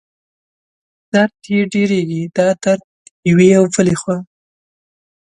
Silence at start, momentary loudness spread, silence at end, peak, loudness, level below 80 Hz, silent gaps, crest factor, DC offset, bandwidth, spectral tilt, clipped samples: 1.15 s; 10 LU; 1.05 s; 0 dBFS; -15 LUFS; -52 dBFS; 2.84-3.23 s; 16 dB; under 0.1%; 11 kHz; -6 dB/octave; under 0.1%